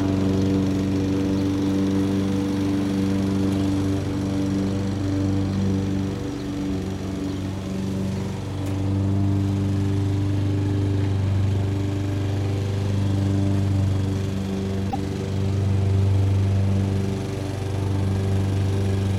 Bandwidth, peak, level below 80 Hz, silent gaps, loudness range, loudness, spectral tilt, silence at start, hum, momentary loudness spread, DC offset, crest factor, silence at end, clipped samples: 11.5 kHz; -10 dBFS; -42 dBFS; none; 3 LU; -24 LUFS; -7.5 dB/octave; 0 s; none; 6 LU; under 0.1%; 12 dB; 0 s; under 0.1%